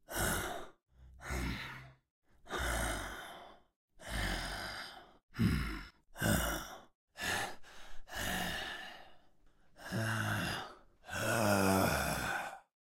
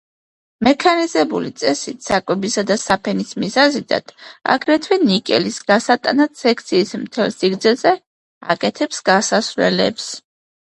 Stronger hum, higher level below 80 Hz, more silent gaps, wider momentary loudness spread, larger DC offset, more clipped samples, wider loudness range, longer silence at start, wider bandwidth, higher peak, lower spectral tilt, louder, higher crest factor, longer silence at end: neither; first, -48 dBFS vs -56 dBFS; first, 2.11-2.22 s, 3.76-3.88 s, 5.23-5.28 s, 6.95-7.08 s vs 8.06-8.41 s; first, 21 LU vs 7 LU; neither; neither; first, 7 LU vs 2 LU; second, 0.1 s vs 0.6 s; first, 16 kHz vs 11.5 kHz; second, -18 dBFS vs 0 dBFS; about the same, -4 dB/octave vs -4 dB/octave; second, -37 LUFS vs -17 LUFS; about the same, 22 dB vs 18 dB; second, 0.2 s vs 0.55 s